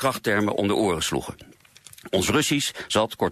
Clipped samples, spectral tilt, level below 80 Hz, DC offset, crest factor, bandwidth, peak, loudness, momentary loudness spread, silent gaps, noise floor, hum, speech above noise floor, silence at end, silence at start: under 0.1%; -3.5 dB/octave; -48 dBFS; under 0.1%; 16 dB; 14.5 kHz; -10 dBFS; -23 LUFS; 8 LU; none; -50 dBFS; none; 26 dB; 0 s; 0 s